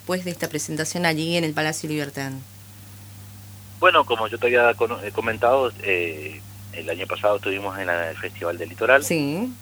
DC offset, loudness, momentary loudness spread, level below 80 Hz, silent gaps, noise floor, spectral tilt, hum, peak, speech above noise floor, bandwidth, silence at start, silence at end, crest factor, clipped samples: under 0.1%; -22 LUFS; 23 LU; -60 dBFS; none; -42 dBFS; -4 dB/octave; 50 Hz at -40 dBFS; -2 dBFS; 20 dB; over 20 kHz; 0 s; 0 s; 22 dB; under 0.1%